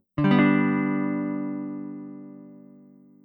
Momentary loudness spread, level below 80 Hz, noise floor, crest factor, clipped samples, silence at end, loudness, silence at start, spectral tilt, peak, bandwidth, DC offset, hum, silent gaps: 23 LU; -60 dBFS; -52 dBFS; 18 dB; under 0.1%; 0.65 s; -24 LUFS; 0.15 s; -10 dB/octave; -8 dBFS; 5 kHz; under 0.1%; none; none